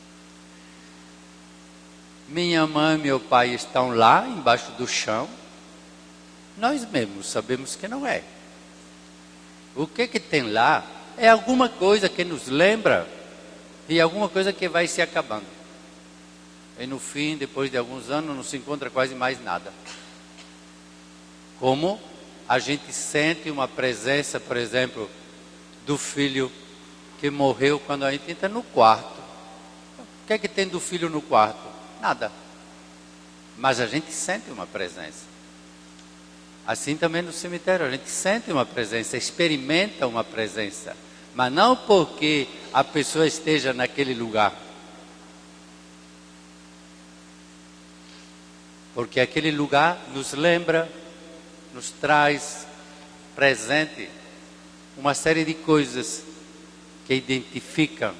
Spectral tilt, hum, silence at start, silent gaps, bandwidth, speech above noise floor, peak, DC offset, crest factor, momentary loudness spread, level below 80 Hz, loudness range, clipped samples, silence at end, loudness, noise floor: -4 dB/octave; 60 Hz at -55 dBFS; 0.35 s; none; 13.5 kHz; 24 dB; -4 dBFS; under 0.1%; 22 dB; 23 LU; -60 dBFS; 8 LU; under 0.1%; 0 s; -23 LUFS; -48 dBFS